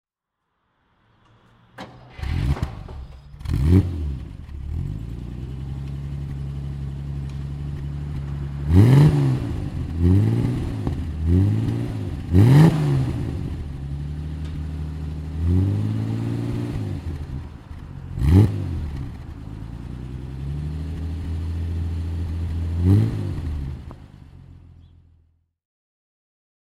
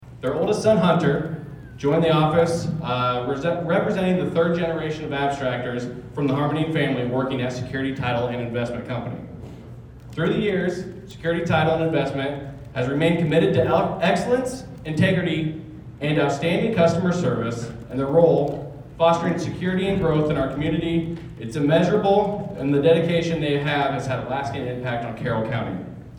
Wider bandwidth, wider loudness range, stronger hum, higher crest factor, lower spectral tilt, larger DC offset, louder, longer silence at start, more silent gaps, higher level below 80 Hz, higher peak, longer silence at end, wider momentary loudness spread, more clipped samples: about the same, 12.5 kHz vs 11.5 kHz; first, 11 LU vs 4 LU; neither; about the same, 22 dB vs 18 dB; first, -8.5 dB/octave vs -7 dB/octave; neither; about the same, -23 LUFS vs -22 LUFS; first, 1.75 s vs 0 s; neither; first, -32 dBFS vs -48 dBFS; about the same, -2 dBFS vs -4 dBFS; first, 2.2 s vs 0 s; first, 19 LU vs 13 LU; neither